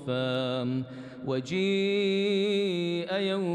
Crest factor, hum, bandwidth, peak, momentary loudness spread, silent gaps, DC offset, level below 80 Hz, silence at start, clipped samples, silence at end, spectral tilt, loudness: 10 dB; none; 9.8 kHz; -18 dBFS; 7 LU; none; under 0.1%; -72 dBFS; 0 s; under 0.1%; 0 s; -6 dB/octave; -28 LUFS